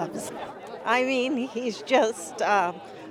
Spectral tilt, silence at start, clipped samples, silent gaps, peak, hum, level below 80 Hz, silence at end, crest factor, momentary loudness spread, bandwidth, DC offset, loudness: -3.5 dB/octave; 0 s; under 0.1%; none; -8 dBFS; none; -72 dBFS; 0 s; 18 dB; 13 LU; 16 kHz; under 0.1%; -26 LUFS